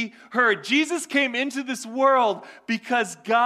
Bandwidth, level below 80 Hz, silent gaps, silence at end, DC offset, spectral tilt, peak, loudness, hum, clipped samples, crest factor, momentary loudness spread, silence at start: 15 kHz; -76 dBFS; none; 0 s; under 0.1%; -3 dB/octave; -8 dBFS; -23 LUFS; none; under 0.1%; 16 dB; 10 LU; 0 s